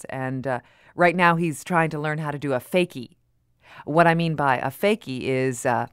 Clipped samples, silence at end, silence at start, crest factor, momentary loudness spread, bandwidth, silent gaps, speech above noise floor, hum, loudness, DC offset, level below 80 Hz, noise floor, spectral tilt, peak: under 0.1%; 0.05 s; 0.1 s; 20 dB; 11 LU; 16 kHz; none; 39 dB; none; -23 LUFS; under 0.1%; -62 dBFS; -62 dBFS; -6 dB/octave; -4 dBFS